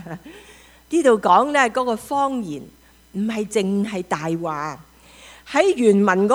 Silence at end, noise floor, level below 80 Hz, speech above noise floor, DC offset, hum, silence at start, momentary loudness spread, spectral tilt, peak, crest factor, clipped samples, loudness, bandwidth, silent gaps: 0 s; -46 dBFS; -56 dBFS; 27 dB; under 0.1%; none; 0 s; 17 LU; -5.5 dB/octave; -2 dBFS; 18 dB; under 0.1%; -20 LUFS; over 20 kHz; none